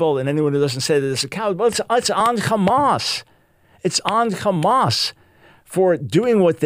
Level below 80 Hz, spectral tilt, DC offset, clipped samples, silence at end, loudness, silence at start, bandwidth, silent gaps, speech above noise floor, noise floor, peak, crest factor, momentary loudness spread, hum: -58 dBFS; -4.5 dB/octave; under 0.1%; under 0.1%; 0 s; -19 LUFS; 0 s; 16 kHz; none; 37 dB; -55 dBFS; 0 dBFS; 18 dB; 6 LU; none